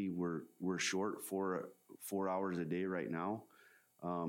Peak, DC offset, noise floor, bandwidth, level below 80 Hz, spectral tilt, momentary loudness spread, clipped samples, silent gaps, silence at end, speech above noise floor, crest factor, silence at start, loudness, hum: -26 dBFS; under 0.1%; -67 dBFS; 17.5 kHz; -80 dBFS; -5 dB/octave; 9 LU; under 0.1%; none; 0 s; 28 dB; 14 dB; 0 s; -40 LUFS; none